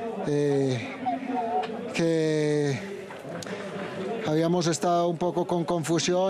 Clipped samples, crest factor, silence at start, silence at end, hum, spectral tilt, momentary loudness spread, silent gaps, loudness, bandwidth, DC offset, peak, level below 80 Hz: under 0.1%; 12 dB; 0 s; 0 s; none; -5.5 dB/octave; 10 LU; none; -27 LUFS; 13 kHz; under 0.1%; -14 dBFS; -66 dBFS